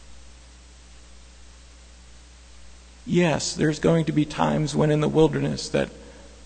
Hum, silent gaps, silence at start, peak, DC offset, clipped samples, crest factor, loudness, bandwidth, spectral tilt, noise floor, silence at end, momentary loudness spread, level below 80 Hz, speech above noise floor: none; none; 0 s; -4 dBFS; under 0.1%; under 0.1%; 20 dB; -23 LUFS; 9.4 kHz; -6 dB/octave; -47 dBFS; 0 s; 7 LU; -46 dBFS; 26 dB